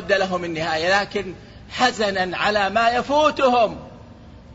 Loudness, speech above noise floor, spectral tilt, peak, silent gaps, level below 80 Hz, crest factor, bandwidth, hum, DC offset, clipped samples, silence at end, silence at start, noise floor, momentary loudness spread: -20 LUFS; 23 dB; -4 dB/octave; -4 dBFS; none; -48 dBFS; 16 dB; 8 kHz; none; under 0.1%; under 0.1%; 0 s; 0 s; -43 dBFS; 13 LU